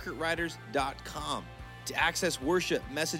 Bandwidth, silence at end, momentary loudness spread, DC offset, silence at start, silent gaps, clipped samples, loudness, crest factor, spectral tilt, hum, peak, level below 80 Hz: 16.5 kHz; 0 s; 10 LU; under 0.1%; 0 s; none; under 0.1%; -32 LUFS; 20 dB; -3.5 dB/octave; none; -12 dBFS; -52 dBFS